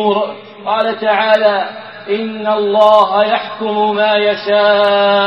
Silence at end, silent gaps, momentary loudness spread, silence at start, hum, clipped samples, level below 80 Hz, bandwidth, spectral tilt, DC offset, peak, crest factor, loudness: 0 s; none; 10 LU; 0 s; none; under 0.1%; -62 dBFS; 6.4 kHz; -5.5 dB/octave; 0.2%; 0 dBFS; 12 dB; -13 LUFS